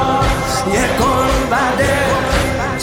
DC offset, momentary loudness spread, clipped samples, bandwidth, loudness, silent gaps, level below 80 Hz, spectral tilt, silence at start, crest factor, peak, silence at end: under 0.1%; 2 LU; under 0.1%; 16.5 kHz; -15 LUFS; none; -26 dBFS; -4.5 dB/octave; 0 s; 12 dB; -4 dBFS; 0 s